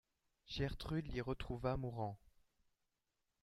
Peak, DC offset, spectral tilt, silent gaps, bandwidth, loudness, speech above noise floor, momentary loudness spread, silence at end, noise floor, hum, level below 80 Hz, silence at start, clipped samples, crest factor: -26 dBFS; under 0.1%; -7 dB/octave; none; 13 kHz; -44 LUFS; 46 dB; 6 LU; 1.15 s; -88 dBFS; none; -56 dBFS; 0.45 s; under 0.1%; 20 dB